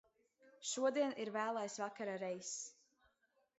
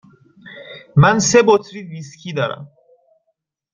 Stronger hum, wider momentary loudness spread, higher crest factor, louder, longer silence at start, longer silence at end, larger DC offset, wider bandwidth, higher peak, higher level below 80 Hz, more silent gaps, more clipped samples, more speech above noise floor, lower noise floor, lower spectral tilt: neither; second, 10 LU vs 23 LU; about the same, 18 dB vs 18 dB; second, -41 LUFS vs -15 LUFS; about the same, 0.45 s vs 0.45 s; second, 0.85 s vs 1.1 s; neither; about the same, 8 kHz vs 7.6 kHz; second, -26 dBFS vs 0 dBFS; second, under -90 dBFS vs -50 dBFS; neither; neither; second, 39 dB vs 56 dB; first, -80 dBFS vs -72 dBFS; second, -3 dB/octave vs -5 dB/octave